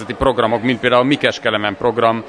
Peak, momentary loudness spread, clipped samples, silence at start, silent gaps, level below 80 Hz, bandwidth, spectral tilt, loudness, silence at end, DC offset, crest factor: 0 dBFS; 4 LU; under 0.1%; 0 s; none; -40 dBFS; 11 kHz; -5.5 dB/octave; -16 LUFS; 0 s; under 0.1%; 16 dB